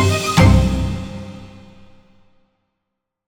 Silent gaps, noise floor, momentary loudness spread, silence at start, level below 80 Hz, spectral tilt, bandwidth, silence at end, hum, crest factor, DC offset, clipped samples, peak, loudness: none; -78 dBFS; 22 LU; 0 s; -26 dBFS; -6 dB/octave; 18.5 kHz; 1.8 s; none; 18 dB; under 0.1%; under 0.1%; 0 dBFS; -15 LUFS